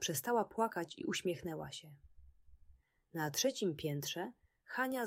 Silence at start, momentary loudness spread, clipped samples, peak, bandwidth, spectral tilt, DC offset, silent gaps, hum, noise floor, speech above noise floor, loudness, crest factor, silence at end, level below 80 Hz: 0 s; 12 LU; under 0.1%; -20 dBFS; 16 kHz; -3.5 dB/octave; under 0.1%; none; none; -67 dBFS; 28 dB; -39 LUFS; 20 dB; 0 s; -70 dBFS